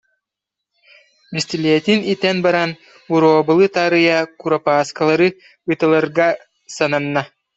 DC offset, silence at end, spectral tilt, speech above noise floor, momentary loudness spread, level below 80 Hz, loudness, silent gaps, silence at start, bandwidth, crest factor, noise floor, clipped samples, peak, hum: under 0.1%; 0.3 s; -5.5 dB/octave; 67 dB; 10 LU; -62 dBFS; -16 LUFS; none; 1.3 s; 8.2 kHz; 16 dB; -83 dBFS; under 0.1%; -2 dBFS; none